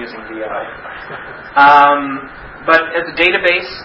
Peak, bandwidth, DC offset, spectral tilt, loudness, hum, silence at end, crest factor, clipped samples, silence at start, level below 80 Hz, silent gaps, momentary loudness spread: 0 dBFS; 8 kHz; under 0.1%; -5 dB/octave; -12 LUFS; none; 0 s; 14 dB; 0.2%; 0 s; -46 dBFS; none; 21 LU